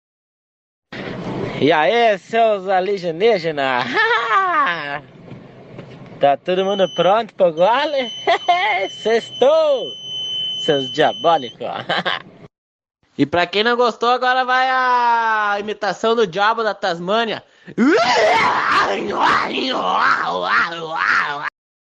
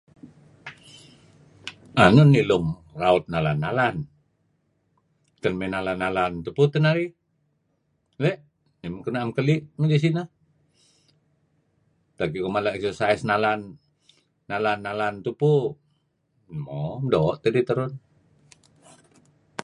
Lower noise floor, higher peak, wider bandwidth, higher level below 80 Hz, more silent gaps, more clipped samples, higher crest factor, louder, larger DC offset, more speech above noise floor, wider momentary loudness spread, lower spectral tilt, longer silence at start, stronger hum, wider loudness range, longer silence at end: second, -38 dBFS vs -71 dBFS; about the same, -2 dBFS vs -2 dBFS; second, 8.6 kHz vs 11 kHz; second, -60 dBFS vs -54 dBFS; first, 12.58-12.79 s vs none; neither; second, 16 dB vs 24 dB; first, -17 LUFS vs -23 LUFS; neither; second, 21 dB vs 49 dB; second, 10 LU vs 19 LU; second, -4 dB/octave vs -7.5 dB/octave; first, 0.9 s vs 0.25 s; neither; second, 3 LU vs 7 LU; first, 0.5 s vs 0 s